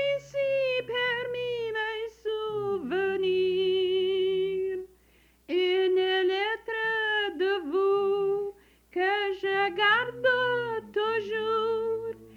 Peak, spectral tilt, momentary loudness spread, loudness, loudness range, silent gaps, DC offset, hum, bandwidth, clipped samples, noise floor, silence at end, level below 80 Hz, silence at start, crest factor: -12 dBFS; -5 dB/octave; 7 LU; -27 LUFS; 2 LU; none; under 0.1%; none; 7 kHz; under 0.1%; -62 dBFS; 0 s; -64 dBFS; 0 s; 16 dB